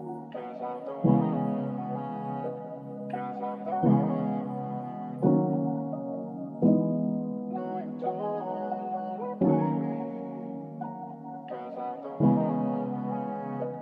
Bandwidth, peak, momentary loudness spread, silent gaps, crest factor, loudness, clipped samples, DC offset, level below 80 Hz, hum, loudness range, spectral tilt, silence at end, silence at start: 3.8 kHz; -10 dBFS; 14 LU; none; 20 dB; -30 LUFS; under 0.1%; under 0.1%; -70 dBFS; none; 3 LU; -12 dB/octave; 0 s; 0 s